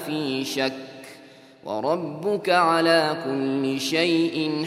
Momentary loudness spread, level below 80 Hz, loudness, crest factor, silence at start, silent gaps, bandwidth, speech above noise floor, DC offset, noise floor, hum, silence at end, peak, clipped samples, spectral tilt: 19 LU; -74 dBFS; -23 LUFS; 20 dB; 0 s; none; 15.5 kHz; 25 dB; under 0.1%; -48 dBFS; none; 0 s; -4 dBFS; under 0.1%; -4.5 dB/octave